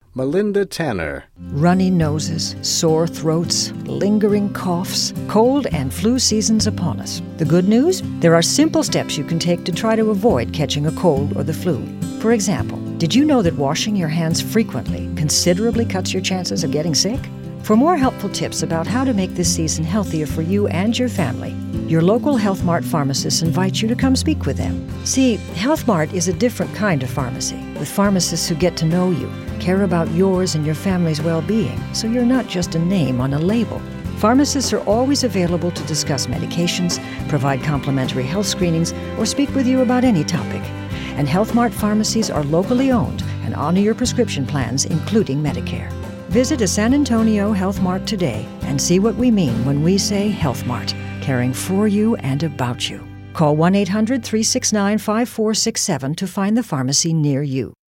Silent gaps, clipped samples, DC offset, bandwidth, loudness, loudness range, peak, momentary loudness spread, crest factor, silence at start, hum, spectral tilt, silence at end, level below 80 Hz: none; under 0.1%; under 0.1%; 16.5 kHz; -18 LUFS; 2 LU; 0 dBFS; 8 LU; 18 dB; 0.15 s; none; -5 dB/octave; 0.2 s; -40 dBFS